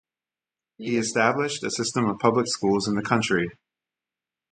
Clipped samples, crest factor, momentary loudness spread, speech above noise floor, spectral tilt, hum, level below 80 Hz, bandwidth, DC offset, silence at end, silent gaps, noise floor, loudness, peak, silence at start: under 0.1%; 22 dB; 5 LU; over 66 dB; -4.5 dB/octave; none; -60 dBFS; 9.6 kHz; under 0.1%; 1 s; none; under -90 dBFS; -24 LUFS; -4 dBFS; 0.8 s